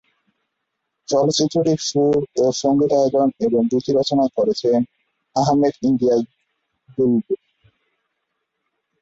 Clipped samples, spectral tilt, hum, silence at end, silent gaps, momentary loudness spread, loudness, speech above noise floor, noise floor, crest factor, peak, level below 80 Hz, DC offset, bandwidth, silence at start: under 0.1%; -6 dB/octave; none; 1.65 s; none; 9 LU; -19 LUFS; 59 dB; -77 dBFS; 14 dB; -4 dBFS; -58 dBFS; under 0.1%; 8 kHz; 1.1 s